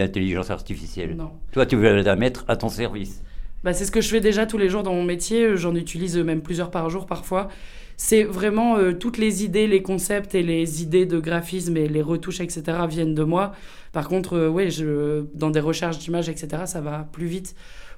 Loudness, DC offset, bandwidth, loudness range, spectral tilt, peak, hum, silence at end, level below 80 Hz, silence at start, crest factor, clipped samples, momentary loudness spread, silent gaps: -23 LUFS; under 0.1%; 17.5 kHz; 3 LU; -5.5 dB/octave; -4 dBFS; none; 0 s; -38 dBFS; 0 s; 20 dB; under 0.1%; 11 LU; none